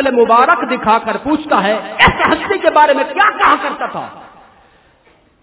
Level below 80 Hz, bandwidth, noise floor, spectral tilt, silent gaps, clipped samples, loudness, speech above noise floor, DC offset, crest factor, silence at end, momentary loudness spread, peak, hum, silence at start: -38 dBFS; 4 kHz; -51 dBFS; -8 dB/octave; none; 0.1%; -12 LUFS; 38 dB; under 0.1%; 14 dB; 1.15 s; 10 LU; 0 dBFS; none; 0 s